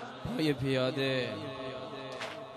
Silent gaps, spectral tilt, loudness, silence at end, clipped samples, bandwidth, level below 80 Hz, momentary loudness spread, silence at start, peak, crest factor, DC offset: none; -6 dB/octave; -34 LUFS; 0 s; under 0.1%; 14 kHz; -62 dBFS; 10 LU; 0 s; -18 dBFS; 16 dB; under 0.1%